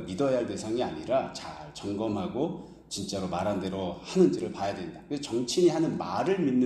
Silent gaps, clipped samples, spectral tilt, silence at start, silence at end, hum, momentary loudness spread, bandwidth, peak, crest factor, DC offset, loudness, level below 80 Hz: none; under 0.1%; -5.5 dB/octave; 0 s; 0 s; none; 12 LU; 12.5 kHz; -10 dBFS; 18 dB; under 0.1%; -29 LUFS; -60 dBFS